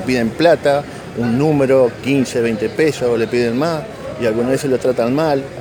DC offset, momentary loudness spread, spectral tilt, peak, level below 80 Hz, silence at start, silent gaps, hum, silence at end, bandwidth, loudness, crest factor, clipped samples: under 0.1%; 7 LU; -6 dB/octave; 0 dBFS; -46 dBFS; 0 s; none; none; 0 s; over 20 kHz; -16 LUFS; 16 dB; under 0.1%